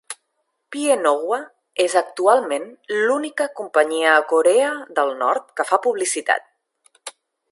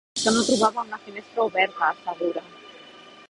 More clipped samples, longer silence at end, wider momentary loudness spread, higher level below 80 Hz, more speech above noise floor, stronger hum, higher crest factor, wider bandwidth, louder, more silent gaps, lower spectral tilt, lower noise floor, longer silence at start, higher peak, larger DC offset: neither; first, 0.4 s vs 0.2 s; second, 16 LU vs 24 LU; second, -80 dBFS vs -64 dBFS; first, 54 dB vs 23 dB; neither; about the same, 20 dB vs 20 dB; about the same, 11.5 kHz vs 11.5 kHz; first, -19 LUFS vs -24 LUFS; neither; second, -1 dB/octave vs -2.5 dB/octave; first, -73 dBFS vs -47 dBFS; about the same, 0.1 s vs 0.15 s; first, 0 dBFS vs -6 dBFS; neither